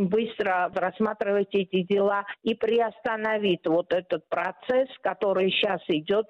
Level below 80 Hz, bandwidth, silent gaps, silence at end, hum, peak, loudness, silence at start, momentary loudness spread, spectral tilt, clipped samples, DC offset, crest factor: -66 dBFS; 6.6 kHz; none; 0.05 s; none; -14 dBFS; -26 LUFS; 0 s; 5 LU; -7.5 dB/octave; under 0.1%; under 0.1%; 12 dB